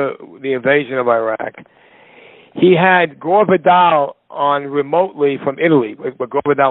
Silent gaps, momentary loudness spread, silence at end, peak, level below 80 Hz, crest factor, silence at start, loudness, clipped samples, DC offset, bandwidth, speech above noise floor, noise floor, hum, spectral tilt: none; 12 LU; 0 s; 0 dBFS; -60 dBFS; 14 dB; 0 s; -15 LUFS; under 0.1%; under 0.1%; 4.1 kHz; 29 dB; -44 dBFS; none; -11 dB/octave